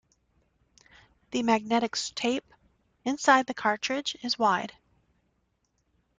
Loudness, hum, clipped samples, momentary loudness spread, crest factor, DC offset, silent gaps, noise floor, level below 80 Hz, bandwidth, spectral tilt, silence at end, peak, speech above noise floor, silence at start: -27 LUFS; none; under 0.1%; 12 LU; 22 dB; under 0.1%; none; -74 dBFS; -68 dBFS; 9.6 kHz; -3 dB/octave; 1.5 s; -8 dBFS; 47 dB; 1.3 s